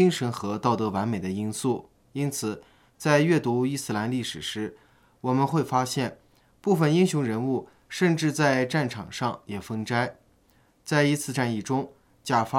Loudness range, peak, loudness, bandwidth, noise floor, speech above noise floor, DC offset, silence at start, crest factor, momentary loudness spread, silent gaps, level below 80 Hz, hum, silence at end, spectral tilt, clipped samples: 3 LU; -6 dBFS; -26 LUFS; 16.5 kHz; -62 dBFS; 37 dB; under 0.1%; 0 s; 20 dB; 11 LU; none; -66 dBFS; none; 0 s; -5.5 dB/octave; under 0.1%